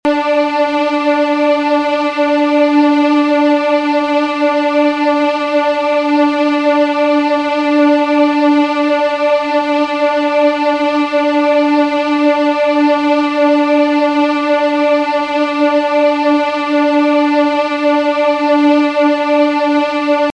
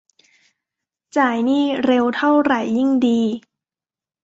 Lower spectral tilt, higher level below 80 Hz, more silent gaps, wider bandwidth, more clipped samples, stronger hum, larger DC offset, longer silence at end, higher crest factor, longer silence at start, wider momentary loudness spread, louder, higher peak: second, -3.5 dB/octave vs -5.5 dB/octave; about the same, -58 dBFS vs -62 dBFS; neither; about the same, 8.4 kHz vs 7.8 kHz; neither; neither; neither; second, 0 s vs 0.85 s; about the same, 12 dB vs 16 dB; second, 0.05 s vs 1.15 s; about the same, 3 LU vs 5 LU; first, -12 LUFS vs -18 LUFS; first, 0 dBFS vs -4 dBFS